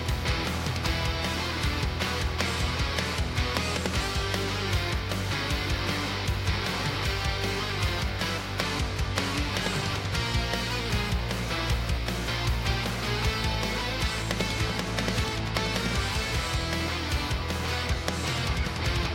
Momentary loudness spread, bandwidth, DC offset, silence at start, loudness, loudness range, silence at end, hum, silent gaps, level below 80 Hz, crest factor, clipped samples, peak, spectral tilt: 2 LU; 16.5 kHz; under 0.1%; 0 s; -28 LUFS; 0 LU; 0 s; none; none; -34 dBFS; 18 dB; under 0.1%; -10 dBFS; -4 dB/octave